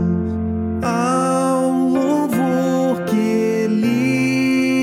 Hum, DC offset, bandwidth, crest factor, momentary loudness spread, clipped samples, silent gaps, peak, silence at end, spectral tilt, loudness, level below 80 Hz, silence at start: none; under 0.1%; 16 kHz; 12 dB; 4 LU; under 0.1%; none; -6 dBFS; 0 s; -6.5 dB/octave; -18 LUFS; -44 dBFS; 0 s